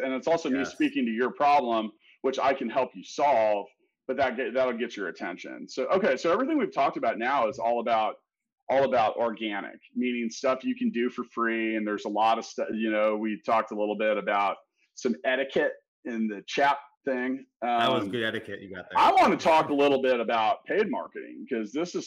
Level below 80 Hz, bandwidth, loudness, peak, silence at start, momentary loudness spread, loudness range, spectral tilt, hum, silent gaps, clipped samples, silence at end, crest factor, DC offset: -70 dBFS; 11.5 kHz; -27 LUFS; -14 dBFS; 0 s; 11 LU; 4 LU; -4.5 dB/octave; none; 8.52-8.56 s, 8.62-8.67 s, 15.88-16.03 s, 16.97-17.01 s, 17.56-17.60 s; under 0.1%; 0 s; 12 dB; under 0.1%